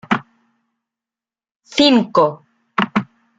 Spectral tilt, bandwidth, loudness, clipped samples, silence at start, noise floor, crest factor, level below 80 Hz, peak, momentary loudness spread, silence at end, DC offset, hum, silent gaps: -5 dB/octave; 9.2 kHz; -17 LUFS; under 0.1%; 0.1 s; under -90 dBFS; 20 dB; -58 dBFS; 0 dBFS; 11 LU; 0.35 s; under 0.1%; none; 1.56-1.60 s